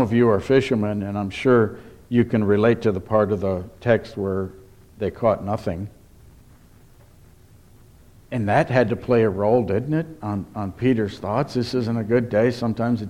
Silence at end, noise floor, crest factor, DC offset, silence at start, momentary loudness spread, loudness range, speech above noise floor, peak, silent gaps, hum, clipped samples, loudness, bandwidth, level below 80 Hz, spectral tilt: 0 s; -50 dBFS; 18 dB; under 0.1%; 0 s; 10 LU; 9 LU; 29 dB; -4 dBFS; none; none; under 0.1%; -22 LUFS; 13 kHz; -50 dBFS; -8 dB/octave